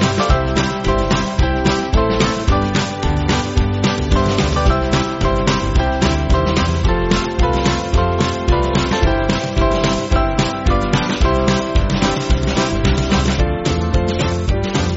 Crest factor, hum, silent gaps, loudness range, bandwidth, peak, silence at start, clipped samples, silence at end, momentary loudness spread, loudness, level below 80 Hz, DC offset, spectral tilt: 14 dB; none; none; 1 LU; 8 kHz; 0 dBFS; 0 s; under 0.1%; 0 s; 2 LU; -17 LUFS; -20 dBFS; under 0.1%; -5 dB/octave